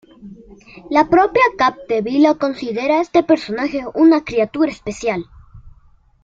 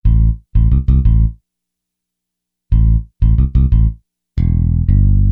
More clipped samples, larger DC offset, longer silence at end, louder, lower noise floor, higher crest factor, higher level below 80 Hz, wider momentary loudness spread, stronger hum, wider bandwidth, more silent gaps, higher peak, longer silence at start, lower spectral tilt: neither; neither; first, 0.55 s vs 0 s; about the same, -16 LUFS vs -15 LUFS; second, -51 dBFS vs -79 dBFS; about the same, 16 dB vs 12 dB; second, -48 dBFS vs -14 dBFS; first, 9 LU vs 6 LU; second, none vs 60 Hz at -35 dBFS; first, 7.8 kHz vs 2.2 kHz; neither; about the same, -2 dBFS vs -2 dBFS; first, 0.25 s vs 0.05 s; second, -5.5 dB/octave vs -12 dB/octave